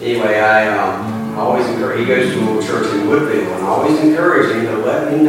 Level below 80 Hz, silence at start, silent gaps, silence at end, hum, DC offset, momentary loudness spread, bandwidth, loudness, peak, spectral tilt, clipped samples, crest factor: -56 dBFS; 0 s; none; 0 s; none; under 0.1%; 6 LU; 16.5 kHz; -15 LUFS; 0 dBFS; -6 dB/octave; under 0.1%; 14 dB